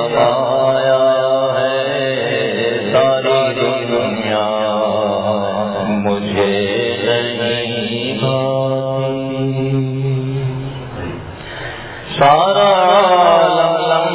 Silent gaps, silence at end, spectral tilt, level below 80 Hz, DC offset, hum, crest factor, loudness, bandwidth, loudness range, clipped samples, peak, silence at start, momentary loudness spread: none; 0 s; -10 dB/octave; -46 dBFS; under 0.1%; none; 14 dB; -15 LUFS; 4 kHz; 5 LU; under 0.1%; 0 dBFS; 0 s; 12 LU